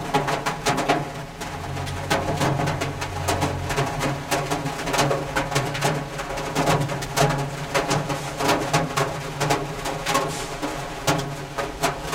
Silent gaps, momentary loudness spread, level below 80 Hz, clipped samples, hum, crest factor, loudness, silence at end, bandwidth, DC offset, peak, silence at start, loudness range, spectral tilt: none; 8 LU; -42 dBFS; under 0.1%; none; 20 dB; -24 LUFS; 0 s; 17 kHz; under 0.1%; -4 dBFS; 0 s; 2 LU; -4 dB/octave